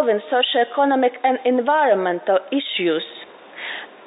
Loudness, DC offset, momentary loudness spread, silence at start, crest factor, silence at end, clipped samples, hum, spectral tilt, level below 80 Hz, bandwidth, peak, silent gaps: -19 LUFS; under 0.1%; 14 LU; 0 s; 14 dB; 0.2 s; under 0.1%; none; -9 dB/octave; -80 dBFS; 4 kHz; -6 dBFS; none